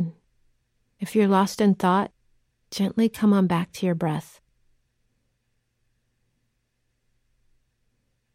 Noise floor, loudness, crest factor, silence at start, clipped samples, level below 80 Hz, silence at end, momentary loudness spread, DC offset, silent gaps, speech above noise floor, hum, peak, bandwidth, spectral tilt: -73 dBFS; -23 LUFS; 18 dB; 0 s; under 0.1%; -66 dBFS; 4.15 s; 13 LU; under 0.1%; none; 52 dB; none; -10 dBFS; 15.5 kHz; -6.5 dB/octave